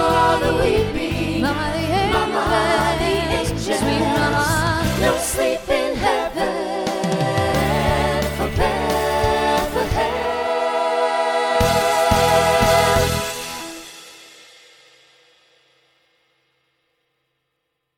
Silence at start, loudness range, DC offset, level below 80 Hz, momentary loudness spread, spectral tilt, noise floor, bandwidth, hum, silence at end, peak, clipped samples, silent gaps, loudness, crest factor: 0 s; 3 LU; under 0.1%; -34 dBFS; 7 LU; -4.5 dB/octave; -75 dBFS; 19 kHz; none; 3.7 s; -2 dBFS; under 0.1%; none; -19 LUFS; 18 dB